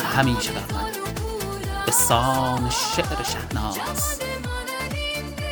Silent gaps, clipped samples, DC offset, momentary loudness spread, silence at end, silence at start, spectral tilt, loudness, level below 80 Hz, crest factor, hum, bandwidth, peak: none; under 0.1%; under 0.1%; 10 LU; 0 s; 0 s; -3.5 dB/octave; -24 LUFS; -36 dBFS; 22 dB; none; over 20 kHz; -4 dBFS